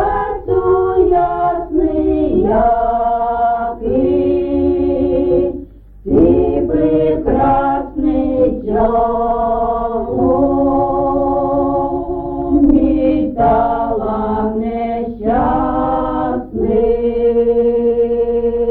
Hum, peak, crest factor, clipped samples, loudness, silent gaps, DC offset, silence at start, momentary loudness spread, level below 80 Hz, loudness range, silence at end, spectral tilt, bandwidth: none; -2 dBFS; 14 dB; under 0.1%; -15 LUFS; none; under 0.1%; 0 s; 6 LU; -30 dBFS; 2 LU; 0 s; -11.5 dB/octave; 4.3 kHz